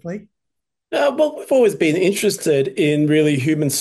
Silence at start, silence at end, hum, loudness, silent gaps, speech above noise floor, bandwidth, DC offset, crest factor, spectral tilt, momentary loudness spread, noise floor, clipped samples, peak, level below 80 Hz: 0.05 s; 0 s; none; -17 LUFS; none; 65 dB; 12.5 kHz; under 0.1%; 14 dB; -5 dB/octave; 5 LU; -82 dBFS; under 0.1%; -4 dBFS; -64 dBFS